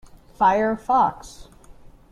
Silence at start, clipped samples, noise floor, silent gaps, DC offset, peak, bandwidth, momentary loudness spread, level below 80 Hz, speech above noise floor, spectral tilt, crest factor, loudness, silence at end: 0.4 s; under 0.1%; -46 dBFS; none; under 0.1%; -8 dBFS; 13.5 kHz; 5 LU; -48 dBFS; 25 dB; -5.5 dB/octave; 16 dB; -20 LUFS; 0.7 s